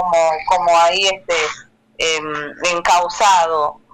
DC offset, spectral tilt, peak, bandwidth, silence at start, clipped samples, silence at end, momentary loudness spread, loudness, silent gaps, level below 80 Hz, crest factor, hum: under 0.1%; -1 dB/octave; -2 dBFS; 15.5 kHz; 0 s; under 0.1%; 0.2 s; 8 LU; -16 LUFS; none; -50 dBFS; 14 dB; none